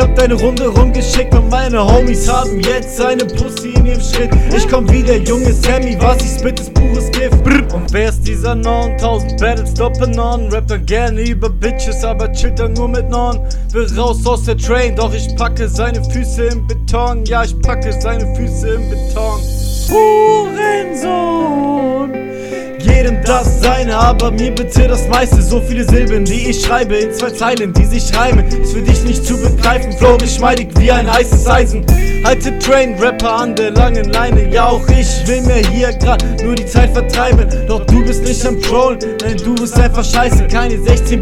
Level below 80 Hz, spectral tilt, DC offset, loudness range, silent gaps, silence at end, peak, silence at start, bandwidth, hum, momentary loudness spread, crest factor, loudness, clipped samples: -14 dBFS; -5.5 dB/octave; under 0.1%; 4 LU; none; 0 s; 0 dBFS; 0 s; 15 kHz; none; 6 LU; 10 dB; -13 LUFS; 0.6%